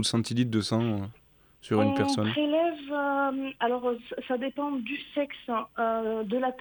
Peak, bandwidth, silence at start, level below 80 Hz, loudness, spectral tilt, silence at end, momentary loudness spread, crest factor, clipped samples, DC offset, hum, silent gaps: -12 dBFS; 19.5 kHz; 0 s; -66 dBFS; -29 LUFS; -5.5 dB/octave; 0 s; 7 LU; 16 dB; under 0.1%; under 0.1%; none; none